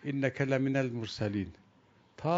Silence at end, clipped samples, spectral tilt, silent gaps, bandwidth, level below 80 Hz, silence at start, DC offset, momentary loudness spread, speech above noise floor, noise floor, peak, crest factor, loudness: 0 s; under 0.1%; -7 dB/octave; none; 7.8 kHz; -64 dBFS; 0 s; under 0.1%; 8 LU; 32 dB; -64 dBFS; -14 dBFS; 18 dB; -33 LUFS